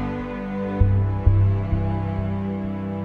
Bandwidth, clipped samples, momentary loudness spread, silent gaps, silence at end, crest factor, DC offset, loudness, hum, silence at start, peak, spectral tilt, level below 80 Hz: 3.9 kHz; under 0.1%; 9 LU; none; 0 s; 18 dB; under 0.1%; -23 LUFS; none; 0 s; -4 dBFS; -10.5 dB/octave; -30 dBFS